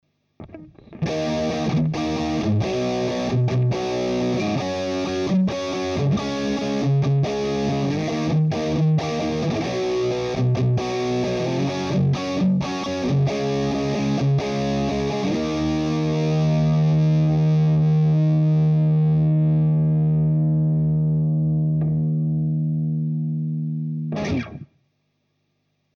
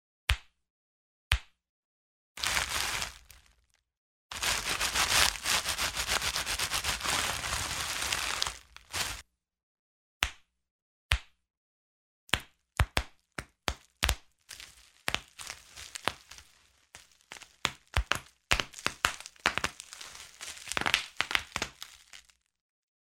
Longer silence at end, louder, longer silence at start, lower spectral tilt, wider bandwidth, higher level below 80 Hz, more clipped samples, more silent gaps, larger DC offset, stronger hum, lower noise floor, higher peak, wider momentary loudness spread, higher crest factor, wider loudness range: first, 1.3 s vs 0.95 s; first, -21 LUFS vs -31 LUFS; about the same, 0.4 s vs 0.3 s; first, -7.5 dB/octave vs -1 dB/octave; second, 7 kHz vs 16.5 kHz; about the same, -46 dBFS vs -44 dBFS; neither; second, none vs 0.70-1.31 s, 1.69-2.35 s, 3.97-4.29 s, 9.63-10.21 s, 10.71-11.09 s, 11.57-12.27 s; neither; neither; about the same, -71 dBFS vs -70 dBFS; second, -12 dBFS vs -4 dBFS; second, 7 LU vs 16 LU; second, 10 dB vs 32 dB; second, 5 LU vs 9 LU